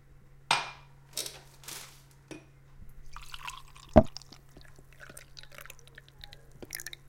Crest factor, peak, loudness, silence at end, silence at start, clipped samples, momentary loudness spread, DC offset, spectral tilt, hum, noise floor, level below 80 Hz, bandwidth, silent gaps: 34 dB; -2 dBFS; -31 LUFS; 0.15 s; 0.1 s; under 0.1%; 28 LU; under 0.1%; -4.5 dB/octave; none; -55 dBFS; -46 dBFS; 17 kHz; none